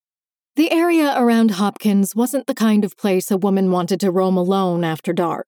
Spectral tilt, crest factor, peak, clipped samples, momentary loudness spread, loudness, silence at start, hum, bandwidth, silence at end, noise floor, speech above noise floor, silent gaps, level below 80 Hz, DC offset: -6 dB/octave; 12 dB; -6 dBFS; under 0.1%; 5 LU; -18 LUFS; 0.55 s; none; 19.5 kHz; 0.05 s; under -90 dBFS; over 73 dB; none; -78 dBFS; under 0.1%